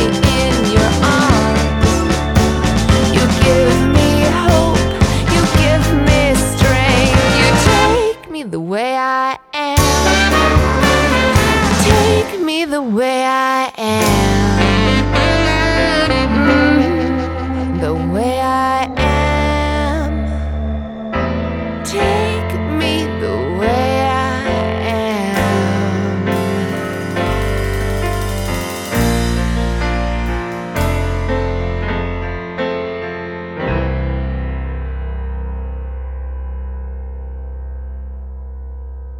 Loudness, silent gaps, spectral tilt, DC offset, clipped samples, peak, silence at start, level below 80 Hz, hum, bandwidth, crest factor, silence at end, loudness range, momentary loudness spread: -15 LUFS; none; -5 dB/octave; under 0.1%; under 0.1%; 0 dBFS; 0 s; -22 dBFS; none; 19 kHz; 14 dB; 0 s; 10 LU; 13 LU